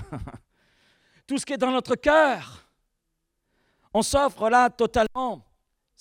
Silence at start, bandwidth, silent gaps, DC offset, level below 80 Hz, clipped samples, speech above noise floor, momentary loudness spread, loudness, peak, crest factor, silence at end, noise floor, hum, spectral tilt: 0 s; 17 kHz; none; under 0.1%; -48 dBFS; under 0.1%; 55 dB; 19 LU; -23 LUFS; -6 dBFS; 20 dB; 0.6 s; -78 dBFS; none; -4 dB/octave